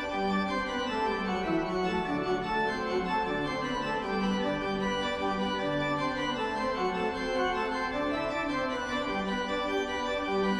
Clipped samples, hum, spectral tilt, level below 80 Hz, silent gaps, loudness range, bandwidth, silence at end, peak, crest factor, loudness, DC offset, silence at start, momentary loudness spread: under 0.1%; none; -5.5 dB/octave; -50 dBFS; none; 0 LU; 11 kHz; 0 s; -18 dBFS; 14 dB; -30 LUFS; under 0.1%; 0 s; 2 LU